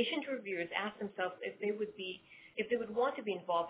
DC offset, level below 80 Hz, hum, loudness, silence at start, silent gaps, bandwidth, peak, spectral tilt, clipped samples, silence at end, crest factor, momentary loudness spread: under 0.1%; -80 dBFS; none; -38 LUFS; 0 s; none; 4 kHz; -20 dBFS; -2 dB/octave; under 0.1%; 0 s; 18 dB; 8 LU